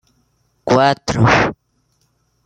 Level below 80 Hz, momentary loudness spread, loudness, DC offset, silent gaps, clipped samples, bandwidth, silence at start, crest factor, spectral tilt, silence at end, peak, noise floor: -42 dBFS; 8 LU; -15 LUFS; under 0.1%; none; under 0.1%; 9.2 kHz; 0.65 s; 16 dB; -5.5 dB/octave; 0.95 s; 0 dBFS; -63 dBFS